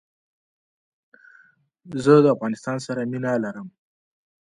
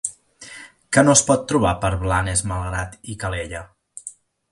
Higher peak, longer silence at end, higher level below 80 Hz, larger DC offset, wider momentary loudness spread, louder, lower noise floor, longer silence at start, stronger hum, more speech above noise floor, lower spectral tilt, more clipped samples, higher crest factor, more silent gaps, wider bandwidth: second, -4 dBFS vs 0 dBFS; first, 0.7 s vs 0.4 s; second, -66 dBFS vs -38 dBFS; neither; second, 18 LU vs 24 LU; about the same, -21 LUFS vs -19 LUFS; first, -57 dBFS vs -42 dBFS; first, 1.85 s vs 0.05 s; neither; first, 36 dB vs 23 dB; first, -7 dB/octave vs -4 dB/octave; neither; about the same, 22 dB vs 22 dB; neither; about the same, 10.5 kHz vs 11.5 kHz